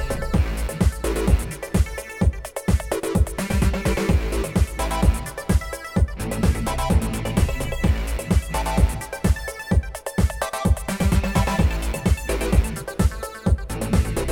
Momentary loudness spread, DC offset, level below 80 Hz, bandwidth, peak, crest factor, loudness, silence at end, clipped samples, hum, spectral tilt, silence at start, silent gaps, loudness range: 3 LU; under 0.1%; -24 dBFS; 17.5 kHz; -4 dBFS; 16 dB; -23 LUFS; 0 s; under 0.1%; none; -6 dB/octave; 0 s; none; 1 LU